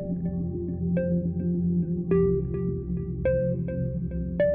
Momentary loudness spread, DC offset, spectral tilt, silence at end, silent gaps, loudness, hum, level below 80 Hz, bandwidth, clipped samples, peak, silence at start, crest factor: 7 LU; under 0.1%; -11 dB/octave; 0 s; none; -27 LUFS; none; -40 dBFS; 3.1 kHz; under 0.1%; -12 dBFS; 0 s; 16 dB